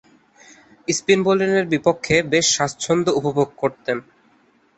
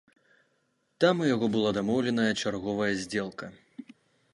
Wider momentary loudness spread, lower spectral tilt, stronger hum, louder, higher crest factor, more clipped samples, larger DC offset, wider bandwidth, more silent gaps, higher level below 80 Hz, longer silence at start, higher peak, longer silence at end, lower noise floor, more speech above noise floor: second, 9 LU vs 19 LU; second, -3.5 dB/octave vs -5.5 dB/octave; neither; first, -19 LUFS vs -28 LUFS; about the same, 18 dB vs 20 dB; neither; neither; second, 8.4 kHz vs 11.5 kHz; neither; first, -54 dBFS vs -64 dBFS; about the same, 0.9 s vs 1 s; first, -2 dBFS vs -10 dBFS; first, 0.75 s vs 0.5 s; second, -58 dBFS vs -73 dBFS; second, 39 dB vs 46 dB